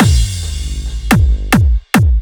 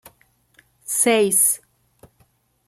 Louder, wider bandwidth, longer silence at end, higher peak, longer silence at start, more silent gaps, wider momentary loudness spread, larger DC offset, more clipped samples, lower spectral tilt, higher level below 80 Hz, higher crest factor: first, -14 LUFS vs -17 LUFS; first, over 20 kHz vs 16.5 kHz; second, 0 s vs 1.1 s; first, 0 dBFS vs -4 dBFS; second, 0 s vs 0.9 s; neither; about the same, 10 LU vs 12 LU; neither; neither; first, -5.5 dB/octave vs -2 dB/octave; first, -14 dBFS vs -68 dBFS; second, 12 dB vs 18 dB